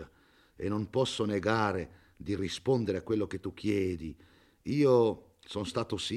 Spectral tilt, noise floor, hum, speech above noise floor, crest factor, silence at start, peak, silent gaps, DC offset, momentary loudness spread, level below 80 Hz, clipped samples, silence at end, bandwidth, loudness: -6 dB/octave; -63 dBFS; none; 33 dB; 18 dB; 0 s; -14 dBFS; none; under 0.1%; 15 LU; -62 dBFS; under 0.1%; 0 s; 12.5 kHz; -31 LUFS